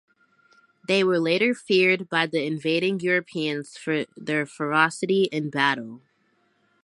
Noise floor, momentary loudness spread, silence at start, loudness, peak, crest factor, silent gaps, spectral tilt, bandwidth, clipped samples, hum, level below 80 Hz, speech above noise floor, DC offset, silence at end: -67 dBFS; 8 LU; 0.9 s; -23 LUFS; -4 dBFS; 22 dB; none; -5 dB/octave; 11.5 kHz; under 0.1%; none; -76 dBFS; 43 dB; under 0.1%; 0.85 s